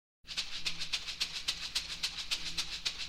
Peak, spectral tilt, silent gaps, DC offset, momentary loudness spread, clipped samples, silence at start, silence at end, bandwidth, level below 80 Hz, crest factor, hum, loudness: -18 dBFS; 0.5 dB/octave; none; under 0.1%; 3 LU; under 0.1%; 0.25 s; 0 s; 16 kHz; -56 dBFS; 20 dB; none; -36 LUFS